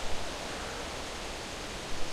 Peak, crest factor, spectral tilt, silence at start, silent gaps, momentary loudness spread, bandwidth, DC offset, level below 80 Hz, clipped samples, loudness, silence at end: -18 dBFS; 16 dB; -2.5 dB/octave; 0 s; none; 1 LU; 15 kHz; under 0.1%; -44 dBFS; under 0.1%; -38 LUFS; 0 s